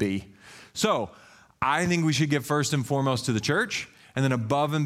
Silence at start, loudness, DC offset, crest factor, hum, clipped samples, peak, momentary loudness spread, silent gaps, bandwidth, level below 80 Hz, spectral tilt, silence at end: 0 s; -26 LUFS; under 0.1%; 16 dB; none; under 0.1%; -10 dBFS; 9 LU; none; 15.5 kHz; -60 dBFS; -5 dB/octave; 0 s